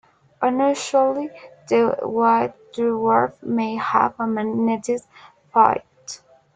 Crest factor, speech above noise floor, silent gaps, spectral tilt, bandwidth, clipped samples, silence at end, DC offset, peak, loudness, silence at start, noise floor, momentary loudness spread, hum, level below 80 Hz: 20 dB; 21 dB; none; -5 dB/octave; 9.4 kHz; under 0.1%; 0.4 s; under 0.1%; 0 dBFS; -21 LUFS; 0.4 s; -40 dBFS; 10 LU; none; -64 dBFS